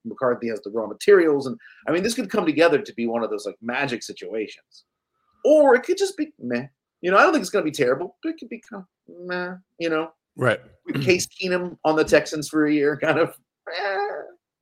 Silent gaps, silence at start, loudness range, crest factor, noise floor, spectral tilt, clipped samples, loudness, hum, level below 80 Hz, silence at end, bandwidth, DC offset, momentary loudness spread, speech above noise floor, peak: none; 0.05 s; 6 LU; 20 dB; -70 dBFS; -4.5 dB/octave; under 0.1%; -22 LUFS; none; -62 dBFS; 0.35 s; 16 kHz; under 0.1%; 16 LU; 48 dB; -2 dBFS